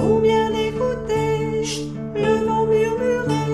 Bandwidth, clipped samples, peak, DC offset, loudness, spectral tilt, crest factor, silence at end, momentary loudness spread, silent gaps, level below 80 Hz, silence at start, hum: 12.5 kHz; under 0.1%; -6 dBFS; under 0.1%; -20 LUFS; -6 dB/octave; 14 dB; 0 s; 6 LU; none; -42 dBFS; 0 s; none